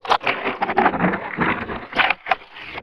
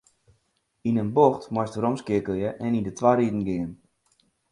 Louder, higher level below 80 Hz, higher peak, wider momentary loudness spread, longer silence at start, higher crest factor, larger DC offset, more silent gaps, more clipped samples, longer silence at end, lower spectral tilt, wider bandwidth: first, -21 LUFS vs -25 LUFS; first, -50 dBFS vs -56 dBFS; first, 0 dBFS vs -4 dBFS; second, 6 LU vs 9 LU; second, 0.05 s vs 0.85 s; about the same, 22 dB vs 22 dB; first, 0.2% vs under 0.1%; neither; neither; second, 0 s vs 0.8 s; second, -6 dB/octave vs -7.5 dB/octave; first, 13 kHz vs 11 kHz